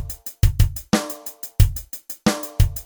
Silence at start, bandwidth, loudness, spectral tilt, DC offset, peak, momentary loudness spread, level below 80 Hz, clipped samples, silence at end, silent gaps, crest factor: 0 s; over 20 kHz; -22 LUFS; -5.5 dB/octave; under 0.1%; 0 dBFS; 12 LU; -24 dBFS; under 0.1%; 0.05 s; none; 20 dB